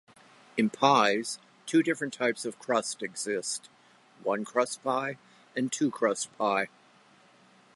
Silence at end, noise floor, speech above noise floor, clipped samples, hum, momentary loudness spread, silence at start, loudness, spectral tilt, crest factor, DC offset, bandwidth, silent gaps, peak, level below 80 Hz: 1.1 s; -60 dBFS; 31 dB; under 0.1%; none; 13 LU; 0.55 s; -29 LUFS; -3.5 dB/octave; 24 dB; under 0.1%; 11.5 kHz; none; -8 dBFS; -82 dBFS